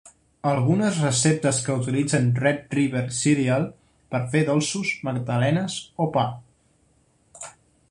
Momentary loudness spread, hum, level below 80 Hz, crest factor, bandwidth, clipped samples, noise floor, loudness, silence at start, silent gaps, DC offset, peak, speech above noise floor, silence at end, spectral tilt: 10 LU; none; -58 dBFS; 18 dB; 11.5 kHz; under 0.1%; -63 dBFS; -23 LUFS; 0.05 s; none; under 0.1%; -6 dBFS; 40 dB; 0.4 s; -5 dB/octave